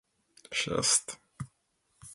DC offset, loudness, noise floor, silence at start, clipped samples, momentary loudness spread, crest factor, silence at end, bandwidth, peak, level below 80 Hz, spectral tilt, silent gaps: under 0.1%; -28 LUFS; -75 dBFS; 0.5 s; under 0.1%; 20 LU; 26 dB; 0 s; 12 kHz; -8 dBFS; -64 dBFS; -1.5 dB/octave; none